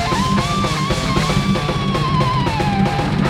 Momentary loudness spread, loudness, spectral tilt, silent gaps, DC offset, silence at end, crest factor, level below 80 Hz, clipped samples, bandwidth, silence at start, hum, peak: 2 LU; -17 LUFS; -5.5 dB/octave; none; under 0.1%; 0 s; 14 dB; -30 dBFS; under 0.1%; 15.5 kHz; 0 s; none; -4 dBFS